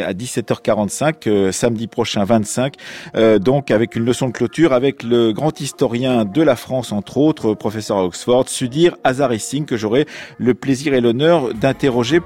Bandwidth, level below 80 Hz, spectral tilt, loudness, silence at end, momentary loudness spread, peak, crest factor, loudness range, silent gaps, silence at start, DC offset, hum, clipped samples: 16 kHz; -50 dBFS; -5.5 dB/octave; -17 LUFS; 0 s; 7 LU; -2 dBFS; 14 dB; 1 LU; none; 0 s; under 0.1%; none; under 0.1%